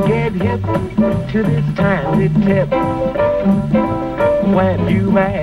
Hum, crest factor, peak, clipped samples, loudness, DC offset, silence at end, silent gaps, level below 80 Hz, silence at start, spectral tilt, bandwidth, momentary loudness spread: none; 12 dB; -2 dBFS; under 0.1%; -15 LUFS; under 0.1%; 0 s; none; -34 dBFS; 0 s; -9 dB/octave; 11 kHz; 4 LU